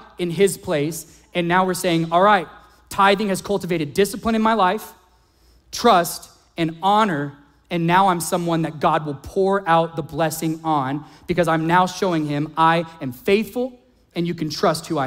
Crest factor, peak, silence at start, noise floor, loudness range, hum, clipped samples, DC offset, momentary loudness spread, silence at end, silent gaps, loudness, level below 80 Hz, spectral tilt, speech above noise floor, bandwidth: 18 dB; -2 dBFS; 0 s; -56 dBFS; 2 LU; none; under 0.1%; under 0.1%; 11 LU; 0 s; none; -20 LUFS; -52 dBFS; -5 dB/octave; 36 dB; 16 kHz